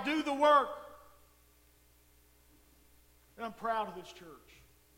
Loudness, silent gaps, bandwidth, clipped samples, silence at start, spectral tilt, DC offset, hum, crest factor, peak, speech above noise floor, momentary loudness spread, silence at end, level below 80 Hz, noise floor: -31 LUFS; none; 16.5 kHz; under 0.1%; 0 s; -4 dB/octave; under 0.1%; none; 22 dB; -14 dBFS; 33 dB; 27 LU; 0.6 s; -68 dBFS; -65 dBFS